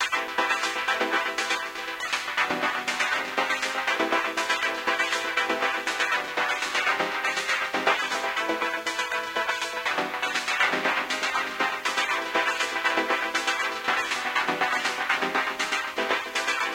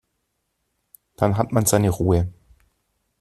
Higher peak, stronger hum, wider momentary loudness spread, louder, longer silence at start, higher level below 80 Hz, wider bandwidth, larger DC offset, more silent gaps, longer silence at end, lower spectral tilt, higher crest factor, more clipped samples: second, -8 dBFS vs -2 dBFS; neither; about the same, 3 LU vs 5 LU; second, -25 LUFS vs -21 LUFS; second, 0 s vs 1.2 s; second, -66 dBFS vs -44 dBFS; first, 17 kHz vs 14.5 kHz; neither; neither; second, 0 s vs 0.9 s; second, -1 dB/octave vs -6 dB/octave; about the same, 18 dB vs 20 dB; neither